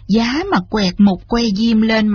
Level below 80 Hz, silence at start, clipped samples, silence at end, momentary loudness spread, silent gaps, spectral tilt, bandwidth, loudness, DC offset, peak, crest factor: -36 dBFS; 0.1 s; under 0.1%; 0 s; 4 LU; none; -5 dB/octave; 6.8 kHz; -15 LUFS; under 0.1%; -2 dBFS; 12 dB